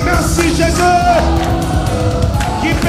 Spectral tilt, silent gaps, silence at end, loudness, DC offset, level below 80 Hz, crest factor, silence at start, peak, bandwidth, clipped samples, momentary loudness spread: -5.5 dB/octave; none; 0 s; -13 LUFS; under 0.1%; -20 dBFS; 12 dB; 0 s; -2 dBFS; 16 kHz; under 0.1%; 4 LU